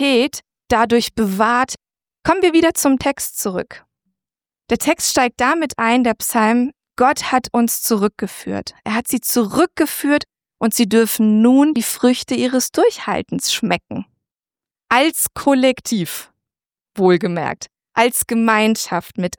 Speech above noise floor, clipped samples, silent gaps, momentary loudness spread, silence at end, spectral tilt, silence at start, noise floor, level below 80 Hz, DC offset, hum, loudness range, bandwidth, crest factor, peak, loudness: over 74 dB; under 0.1%; none; 10 LU; 0.05 s; -3.5 dB/octave; 0 s; under -90 dBFS; -50 dBFS; under 0.1%; none; 3 LU; 19.5 kHz; 16 dB; -2 dBFS; -17 LUFS